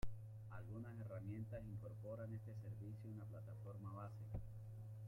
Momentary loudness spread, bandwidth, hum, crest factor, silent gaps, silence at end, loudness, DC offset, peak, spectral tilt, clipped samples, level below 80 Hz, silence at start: 5 LU; 14.5 kHz; none; 18 dB; none; 0 s; -53 LUFS; under 0.1%; -32 dBFS; -9 dB/octave; under 0.1%; -62 dBFS; 0 s